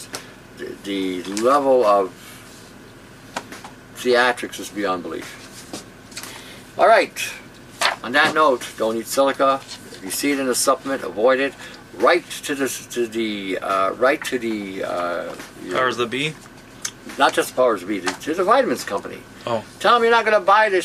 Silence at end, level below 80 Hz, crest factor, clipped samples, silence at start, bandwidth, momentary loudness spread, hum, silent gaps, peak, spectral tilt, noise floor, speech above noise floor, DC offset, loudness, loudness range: 0 s; -58 dBFS; 20 dB; under 0.1%; 0 s; 15 kHz; 20 LU; none; none; -2 dBFS; -3 dB/octave; -43 dBFS; 23 dB; under 0.1%; -20 LUFS; 5 LU